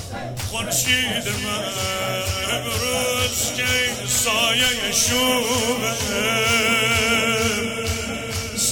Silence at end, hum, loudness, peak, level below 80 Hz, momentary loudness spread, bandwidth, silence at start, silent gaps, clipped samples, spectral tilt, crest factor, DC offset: 0 s; none; -20 LUFS; -4 dBFS; -42 dBFS; 8 LU; 17.5 kHz; 0 s; none; under 0.1%; -2 dB/octave; 16 dB; under 0.1%